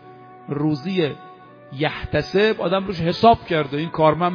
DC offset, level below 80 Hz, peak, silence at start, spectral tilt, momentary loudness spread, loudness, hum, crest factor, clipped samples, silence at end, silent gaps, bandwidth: under 0.1%; -46 dBFS; -2 dBFS; 0.05 s; -7.5 dB/octave; 12 LU; -20 LUFS; none; 20 dB; under 0.1%; 0 s; none; 5.2 kHz